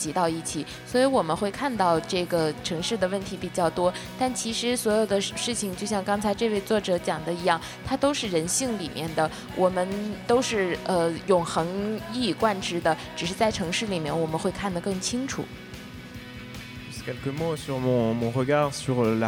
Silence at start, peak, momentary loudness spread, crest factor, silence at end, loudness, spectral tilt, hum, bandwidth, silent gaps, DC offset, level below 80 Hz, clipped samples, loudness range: 0 s; -8 dBFS; 9 LU; 18 dB; 0 s; -26 LUFS; -4.5 dB/octave; none; 18 kHz; none; under 0.1%; -52 dBFS; under 0.1%; 5 LU